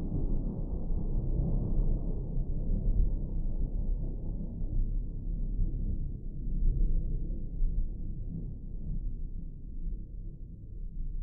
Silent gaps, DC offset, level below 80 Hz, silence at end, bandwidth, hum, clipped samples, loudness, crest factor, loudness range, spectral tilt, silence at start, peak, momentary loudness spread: none; under 0.1%; -32 dBFS; 0 s; 1.1 kHz; none; under 0.1%; -37 LUFS; 16 dB; 6 LU; -16.5 dB/octave; 0 s; -14 dBFS; 11 LU